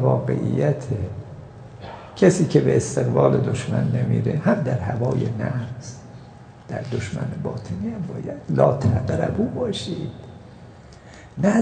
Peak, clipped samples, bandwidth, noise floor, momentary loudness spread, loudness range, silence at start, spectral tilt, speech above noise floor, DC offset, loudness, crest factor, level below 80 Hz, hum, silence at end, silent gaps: -2 dBFS; under 0.1%; 9.4 kHz; -43 dBFS; 20 LU; 7 LU; 0 s; -7 dB/octave; 22 dB; under 0.1%; -22 LUFS; 20 dB; -48 dBFS; none; 0 s; none